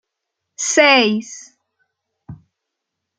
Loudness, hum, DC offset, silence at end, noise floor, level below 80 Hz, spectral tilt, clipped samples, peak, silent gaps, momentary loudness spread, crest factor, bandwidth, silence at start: -14 LUFS; none; under 0.1%; 0.85 s; -79 dBFS; -64 dBFS; -2 dB/octave; under 0.1%; 0 dBFS; none; 24 LU; 20 dB; 10 kHz; 0.6 s